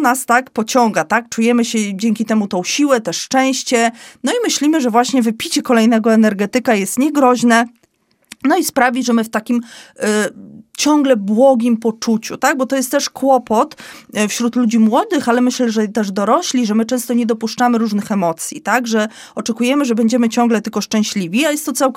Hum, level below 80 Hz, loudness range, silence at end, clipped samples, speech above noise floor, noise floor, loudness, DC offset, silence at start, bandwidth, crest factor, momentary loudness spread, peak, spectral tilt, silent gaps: none; -64 dBFS; 2 LU; 0.05 s; under 0.1%; 44 dB; -59 dBFS; -15 LUFS; under 0.1%; 0 s; 16 kHz; 16 dB; 6 LU; 0 dBFS; -4 dB/octave; none